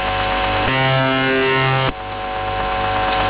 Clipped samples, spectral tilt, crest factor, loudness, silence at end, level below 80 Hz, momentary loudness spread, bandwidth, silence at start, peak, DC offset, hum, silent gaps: under 0.1%; -9 dB/octave; 12 dB; -17 LUFS; 0 s; -34 dBFS; 7 LU; 4 kHz; 0 s; -6 dBFS; under 0.1%; none; none